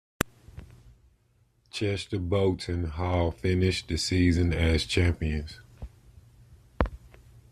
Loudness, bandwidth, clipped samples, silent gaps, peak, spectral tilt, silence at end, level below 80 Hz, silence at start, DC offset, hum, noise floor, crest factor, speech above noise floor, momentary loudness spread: -28 LUFS; 14 kHz; under 0.1%; none; -2 dBFS; -5.5 dB/octave; 0.1 s; -42 dBFS; 0.2 s; under 0.1%; none; -66 dBFS; 26 dB; 40 dB; 22 LU